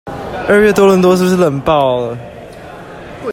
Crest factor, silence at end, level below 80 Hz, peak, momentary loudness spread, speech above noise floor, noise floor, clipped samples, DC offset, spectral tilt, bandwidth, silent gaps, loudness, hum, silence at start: 12 dB; 0 s; -42 dBFS; 0 dBFS; 23 LU; 21 dB; -31 dBFS; under 0.1%; under 0.1%; -6 dB/octave; 16.5 kHz; none; -11 LUFS; none; 0.05 s